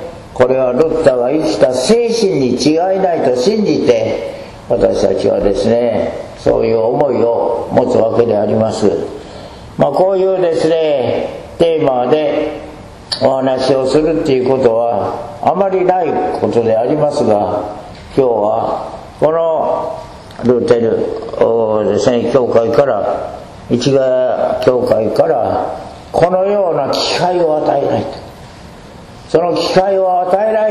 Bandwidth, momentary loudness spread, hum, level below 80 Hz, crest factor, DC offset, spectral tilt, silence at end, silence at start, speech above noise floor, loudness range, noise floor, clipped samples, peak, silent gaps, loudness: 12 kHz; 9 LU; none; -42 dBFS; 14 dB; under 0.1%; -6 dB/octave; 0 s; 0 s; 22 dB; 2 LU; -34 dBFS; 0.1%; 0 dBFS; none; -13 LUFS